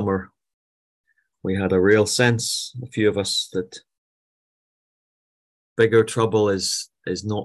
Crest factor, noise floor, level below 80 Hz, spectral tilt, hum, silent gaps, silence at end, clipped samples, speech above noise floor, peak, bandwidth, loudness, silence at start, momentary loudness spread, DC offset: 20 dB; under -90 dBFS; -50 dBFS; -4.5 dB/octave; none; 0.54-1.04 s, 3.98-5.76 s; 0 s; under 0.1%; over 69 dB; -4 dBFS; 12.5 kHz; -21 LUFS; 0 s; 13 LU; under 0.1%